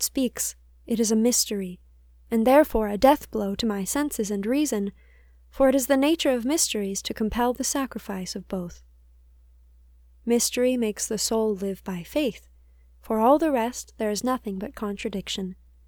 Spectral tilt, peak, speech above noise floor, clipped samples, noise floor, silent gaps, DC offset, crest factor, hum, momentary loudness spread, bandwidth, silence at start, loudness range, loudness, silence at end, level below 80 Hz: -3.5 dB/octave; -4 dBFS; 30 dB; under 0.1%; -54 dBFS; none; under 0.1%; 22 dB; none; 12 LU; over 20 kHz; 0 s; 6 LU; -25 LUFS; 0.35 s; -48 dBFS